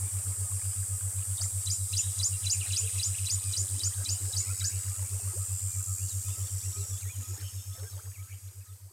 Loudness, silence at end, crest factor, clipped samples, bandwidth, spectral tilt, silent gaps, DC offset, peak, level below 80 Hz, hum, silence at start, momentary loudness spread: -31 LUFS; 0 s; 16 dB; under 0.1%; 16.5 kHz; -1.5 dB/octave; none; under 0.1%; -16 dBFS; -54 dBFS; none; 0 s; 12 LU